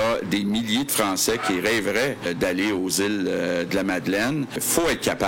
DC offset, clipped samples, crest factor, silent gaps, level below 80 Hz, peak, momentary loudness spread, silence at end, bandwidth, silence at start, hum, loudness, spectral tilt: under 0.1%; under 0.1%; 18 dB; none; -50 dBFS; -6 dBFS; 3 LU; 0 s; 17 kHz; 0 s; none; -23 LUFS; -3.5 dB/octave